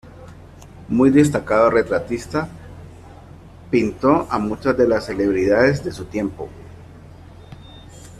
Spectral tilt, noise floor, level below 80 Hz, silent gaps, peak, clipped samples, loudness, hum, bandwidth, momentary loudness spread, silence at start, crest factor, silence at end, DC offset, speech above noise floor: -7 dB/octave; -41 dBFS; -46 dBFS; none; -4 dBFS; under 0.1%; -18 LUFS; none; 13 kHz; 19 LU; 0.05 s; 18 dB; 0 s; under 0.1%; 23 dB